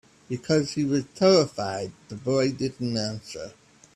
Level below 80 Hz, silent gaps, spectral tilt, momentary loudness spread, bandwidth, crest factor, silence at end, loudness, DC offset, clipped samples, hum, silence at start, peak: -62 dBFS; none; -5.5 dB/octave; 17 LU; 11.5 kHz; 18 dB; 0.45 s; -25 LUFS; under 0.1%; under 0.1%; none; 0.3 s; -8 dBFS